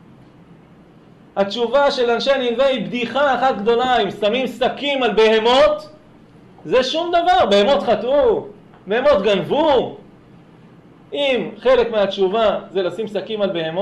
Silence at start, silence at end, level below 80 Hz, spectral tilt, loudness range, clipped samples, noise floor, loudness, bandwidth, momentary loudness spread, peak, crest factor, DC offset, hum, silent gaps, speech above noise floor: 1.35 s; 0 s; -50 dBFS; -5 dB/octave; 3 LU; under 0.1%; -46 dBFS; -17 LUFS; 11 kHz; 9 LU; -6 dBFS; 12 dB; under 0.1%; none; none; 29 dB